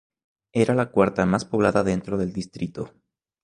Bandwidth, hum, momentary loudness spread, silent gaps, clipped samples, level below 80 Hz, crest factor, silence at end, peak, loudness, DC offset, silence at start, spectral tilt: 11 kHz; none; 11 LU; none; under 0.1%; -50 dBFS; 20 dB; 0.55 s; -4 dBFS; -23 LUFS; under 0.1%; 0.55 s; -7 dB/octave